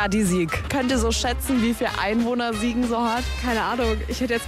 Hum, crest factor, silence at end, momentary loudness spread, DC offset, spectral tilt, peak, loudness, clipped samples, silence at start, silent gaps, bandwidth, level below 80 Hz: none; 12 dB; 0 s; 3 LU; under 0.1%; -4.5 dB/octave; -10 dBFS; -23 LUFS; under 0.1%; 0 s; none; 15.5 kHz; -32 dBFS